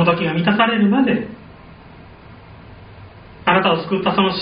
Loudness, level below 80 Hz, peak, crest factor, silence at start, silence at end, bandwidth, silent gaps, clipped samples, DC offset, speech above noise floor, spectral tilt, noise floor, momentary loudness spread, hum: -17 LUFS; -50 dBFS; 0 dBFS; 18 dB; 0 s; 0 s; 5.2 kHz; none; under 0.1%; under 0.1%; 24 dB; -4 dB/octave; -41 dBFS; 8 LU; none